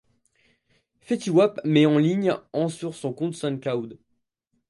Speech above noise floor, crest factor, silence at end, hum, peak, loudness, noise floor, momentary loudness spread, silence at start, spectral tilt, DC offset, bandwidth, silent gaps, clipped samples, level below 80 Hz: 52 dB; 18 dB; 0.75 s; none; -6 dBFS; -24 LUFS; -75 dBFS; 12 LU; 1.1 s; -6.5 dB/octave; under 0.1%; 11.5 kHz; none; under 0.1%; -70 dBFS